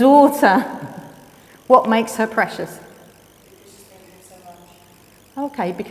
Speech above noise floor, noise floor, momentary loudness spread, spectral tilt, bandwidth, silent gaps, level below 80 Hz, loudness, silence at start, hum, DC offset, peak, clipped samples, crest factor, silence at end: 33 dB; -49 dBFS; 23 LU; -5 dB/octave; 16 kHz; none; -62 dBFS; -17 LUFS; 0 s; none; under 0.1%; 0 dBFS; under 0.1%; 20 dB; 0 s